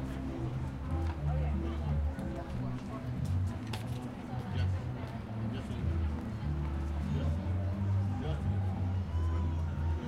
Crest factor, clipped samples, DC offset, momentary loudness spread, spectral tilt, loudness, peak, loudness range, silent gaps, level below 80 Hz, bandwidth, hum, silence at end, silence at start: 12 dB; under 0.1%; under 0.1%; 6 LU; -8 dB/octave; -36 LUFS; -22 dBFS; 3 LU; none; -40 dBFS; 11 kHz; none; 0 s; 0 s